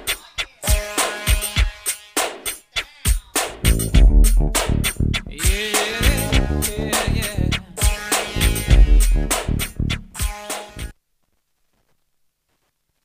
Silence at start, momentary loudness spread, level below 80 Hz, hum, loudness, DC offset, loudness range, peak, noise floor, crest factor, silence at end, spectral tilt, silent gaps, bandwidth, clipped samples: 0 s; 10 LU; -20 dBFS; none; -20 LUFS; under 0.1%; 7 LU; 0 dBFS; -70 dBFS; 18 dB; 2.15 s; -3.5 dB/octave; none; 15.5 kHz; under 0.1%